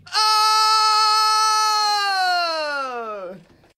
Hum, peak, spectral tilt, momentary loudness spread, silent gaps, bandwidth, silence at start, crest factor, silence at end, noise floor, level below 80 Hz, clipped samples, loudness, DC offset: none; -6 dBFS; 1.5 dB/octave; 14 LU; none; 16 kHz; 0.05 s; 14 dB; 0.4 s; -41 dBFS; -68 dBFS; under 0.1%; -17 LUFS; under 0.1%